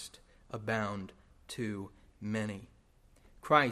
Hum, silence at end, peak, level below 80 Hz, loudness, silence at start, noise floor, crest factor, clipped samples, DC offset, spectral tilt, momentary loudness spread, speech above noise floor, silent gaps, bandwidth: none; 0 s; -10 dBFS; -64 dBFS; -36 LUFS; 0 s; -64 dBFS; 28 dB; under 0.1%; under 0.1%; -5.5 dB/octave; 19 LU; 30 dB; none; 14.5 kHz